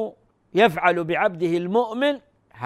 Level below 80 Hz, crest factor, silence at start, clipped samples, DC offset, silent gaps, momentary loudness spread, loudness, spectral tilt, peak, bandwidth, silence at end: -62 dBFS; 18 dB; 0 s; under 0.1%; under 0.1%; none; 9 LU; -21 LUFS; -6 dB/octave; -4 dBFS; 15 kHz; 0 s